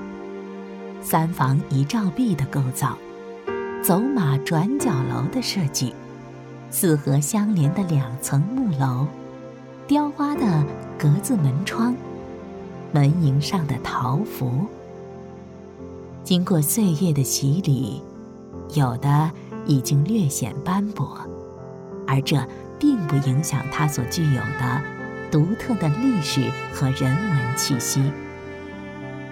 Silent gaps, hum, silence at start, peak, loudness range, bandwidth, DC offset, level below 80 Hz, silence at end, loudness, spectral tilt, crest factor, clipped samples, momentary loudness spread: none; none; 0 s; -6 dBFS; 2 LU; 17 kHz; under 0.1%; -54 dBFS; 0 s; -22 LUFS; -5.5 dB/octave; 16 dB; under 0.1%; 17 LU